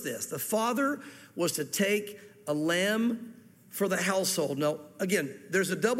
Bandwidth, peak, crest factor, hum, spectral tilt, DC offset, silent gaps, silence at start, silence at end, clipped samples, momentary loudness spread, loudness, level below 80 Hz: 16.5 kHz; -14 dBFS; 16 dB; none; -3.5 dB/octave; under 0.1%; none; 0 s; 0 s; under 0.1%; 12 LU; -30 LUFS; -76 dBFS